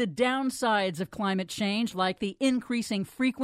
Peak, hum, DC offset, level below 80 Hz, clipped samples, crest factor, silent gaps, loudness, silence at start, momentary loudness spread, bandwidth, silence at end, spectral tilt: -12 dBFS; none; under 0.1%; -64 dBFS; under 0.1%; 16 dB; none; -28 LUFS; 0 s; 4 LU; 15 kHz; 0 s; -4.5 dB/octave